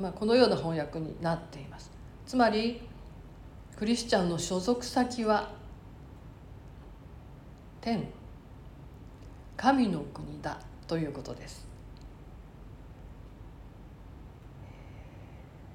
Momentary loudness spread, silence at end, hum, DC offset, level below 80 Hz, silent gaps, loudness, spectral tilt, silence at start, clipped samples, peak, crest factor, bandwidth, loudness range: 24 LU; 0 s; none; under 0.1%; -52 dBFS; none; -30 LUFS; -5.5 dB/octave; 0 s; under 0.1%; -10 dBFS; 24 dB; 16 kHz; 19 LU